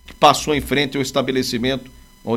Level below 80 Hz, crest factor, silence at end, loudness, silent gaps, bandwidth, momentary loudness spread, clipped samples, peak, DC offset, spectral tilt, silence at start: -42 dBFS; 18 dB; 0 s; -19 LUFS; none; 16.5 kHz; 9 LU; under 0.1%; 0 dBFS; under 0.1%; -4 dB/octave; 0.1 s